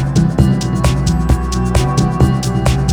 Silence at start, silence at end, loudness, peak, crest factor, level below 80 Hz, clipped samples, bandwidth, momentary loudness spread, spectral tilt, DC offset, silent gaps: 0 s; 0 s; -14 LUFS; 0 dBFS; 12 dB; -20 dBFS; under 0.1%; 14 kHz; 3 LU; -6.5 dB/octave; under 0.1%; none